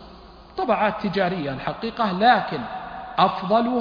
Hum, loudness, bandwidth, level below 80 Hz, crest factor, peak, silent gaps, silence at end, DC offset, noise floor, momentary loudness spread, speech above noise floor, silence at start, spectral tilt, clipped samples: none; -22 LUFS; 5.2 kHz; -52 dBFS; 18 dB; -4 dBFS; none; 0 s; under 0.1%; -45 dBFS; 12 LU; 23 dB; 0 s; -7.5 dB/octave; under 0.1%